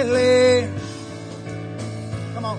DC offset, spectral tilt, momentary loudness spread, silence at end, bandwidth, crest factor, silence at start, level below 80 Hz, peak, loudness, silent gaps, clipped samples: under 0.1%; -5.5 dB/octave; 18 LU; 0 s; 10.5 kHz; 14 dB; 0 s; -54 dBFS; -8 dBFS; -20 LUFS; none; under 0.1%